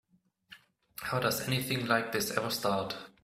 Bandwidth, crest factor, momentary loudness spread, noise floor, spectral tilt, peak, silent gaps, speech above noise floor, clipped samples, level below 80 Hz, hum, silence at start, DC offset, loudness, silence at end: 16 kHz; 22 dB; 9 LU; -60 dBFS; -4 dB/octave; -12 dBFS; none; 28 dB; under 0.1%; -64 dBFS; none; 0.5 s; under 0.1%; -32 LUFS; 0.15 s